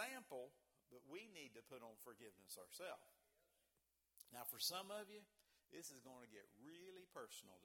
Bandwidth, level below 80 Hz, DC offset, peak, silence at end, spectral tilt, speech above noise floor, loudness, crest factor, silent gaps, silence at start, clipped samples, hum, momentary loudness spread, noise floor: 18 kHz; under -90 dBFS; under 0.1%; -32 dBFS; 0 s; -1.5 dB/octave; 30 dB; -55 LUFS; 24 dB; none; 0 s; under 0.1%; none; 18 LU; -87 dBFS